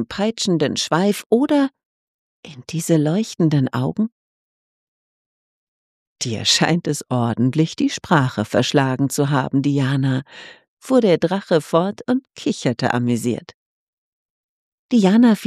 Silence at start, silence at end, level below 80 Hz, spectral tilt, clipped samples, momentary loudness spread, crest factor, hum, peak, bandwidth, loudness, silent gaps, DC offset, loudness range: 0 s; 0 s; -60 dBFS; -5.5 dB/octave; under 0.1%; 9 LU; 18 dB; none; -2 dBFS; 14.5 kHz; -19 LUFS; 1.26-1.30 s, 1.86-2.43 s, 4.12-6.16 s, 10.68-10.77 s, 13.54-14.89 s; under 0.1%; 4 LU